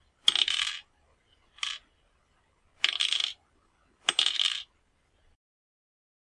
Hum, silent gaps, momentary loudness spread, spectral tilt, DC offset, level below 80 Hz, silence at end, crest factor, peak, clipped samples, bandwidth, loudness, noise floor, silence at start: none; none; 17 LU; 2.5 dB/octave; under 0.1%; -72 dBFS; 1.7 s; 28 dB; -6 dBFS; under 0.1%; 11.5 kHz; -27 LUFS; -69 dBFS; 0.25 s